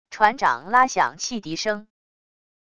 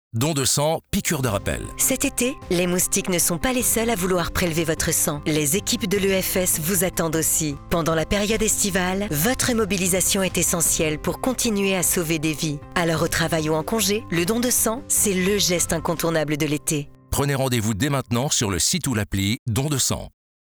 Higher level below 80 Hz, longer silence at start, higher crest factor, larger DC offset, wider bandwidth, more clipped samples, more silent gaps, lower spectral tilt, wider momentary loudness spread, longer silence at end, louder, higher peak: second, -60 dBFS vs -40 dBFS; about the same, 0.1 s vs 0.15 s; first, 22 dB vs 16 dB; first, 0.4% vs under 0.1%; second, 11 kHz vs over 20 kHz; neither; second, none vs 19.39-19.46 s; about the same, -2.5 dB/octave vs -3.5 dB/octave; first, 9 LU vs 5 LU; first, 0.8 s vs 0.5 s; about the same, -21 LUFS vs -21 LUFS; first, -2 dBFS vs -6 dBFS